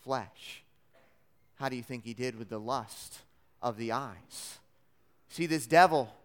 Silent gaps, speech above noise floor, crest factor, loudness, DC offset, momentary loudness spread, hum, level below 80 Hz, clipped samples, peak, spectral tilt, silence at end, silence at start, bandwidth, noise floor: none; 40 dB; 26 dB; -31 LUFS; under 0.1%; 23 LU; none; -72 dBFS; under 0.1%; -8 dBFS; -4.5 dB/octave; 0.15 s; 0.05 s; 17.5 kHz; -72 dBFS